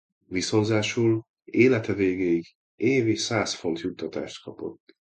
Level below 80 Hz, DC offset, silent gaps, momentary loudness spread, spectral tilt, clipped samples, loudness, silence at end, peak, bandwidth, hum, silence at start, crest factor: -58 dBFS; under 0.1%; 1.29-1.34 s, 2.55-2.78 s; 14 LU; -5 dB/octave; under 0.1%; -25 LUFS; 0.45 s; -6 dBFS; 9.2 kHz; none; 0.3 s; 20 dB